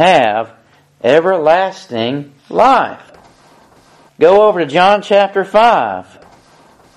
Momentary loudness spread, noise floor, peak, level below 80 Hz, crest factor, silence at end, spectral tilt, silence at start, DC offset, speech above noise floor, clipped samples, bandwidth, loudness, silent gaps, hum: 11 LU; -46 dBFS; 0 dBFS; -54 dBFS; 14 dB; 0.95 s; -5 dB/octave; 0 s; under 0.1%; 35 dB; under 0.1%; 11.5 kHz; -12 LUFS; none; none